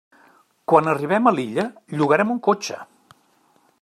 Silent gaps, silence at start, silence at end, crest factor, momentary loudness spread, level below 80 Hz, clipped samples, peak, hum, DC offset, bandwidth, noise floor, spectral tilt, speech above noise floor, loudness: none; 0.7 s; 0.95 s; 20 dB; 12 LU; -70 dBFS; under 0.1%; -2 dBFS; none; under 0.1%; 13.5 kHz; -60 dBFS; -6 dB/octave; 41 dB; -20 LUFS